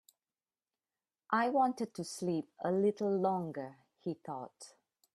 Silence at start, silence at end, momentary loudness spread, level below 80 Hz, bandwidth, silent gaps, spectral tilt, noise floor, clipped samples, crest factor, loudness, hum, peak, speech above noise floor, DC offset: 1.3 s; 0.45 s; 15 LU; -82 dBFS; 13.5 kHz; none; -6 dB/octave; under -90 dBFS; under 0.1%; 18 dB; -35 LUFS; none; -18 dBFS; over 56 dB; under 0.1%